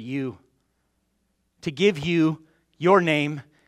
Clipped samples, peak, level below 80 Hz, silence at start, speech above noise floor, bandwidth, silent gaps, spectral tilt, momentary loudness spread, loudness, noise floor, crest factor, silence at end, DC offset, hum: under 0.1%; -4 dBFS; -64 dBFS; 0 s; 50 dB; 12 kHz; none; -6.5 dB/octave; 15 LU; -22 LUFS; -72 dBFS; 20 dB; 0.25 s; under 0.1%; none